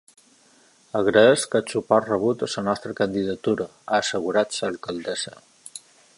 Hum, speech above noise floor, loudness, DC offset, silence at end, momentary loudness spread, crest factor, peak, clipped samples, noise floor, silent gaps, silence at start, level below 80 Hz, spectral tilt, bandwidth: none; 34 dB; -23 LUFS; under 0.1%; 0.4 s; 14 LU; 22 dB; -2 dBFS; under 0.1%; -57 dBFS; none; 0.95 s; -62 dBFS; -4 dB/octave; 11.5 kHz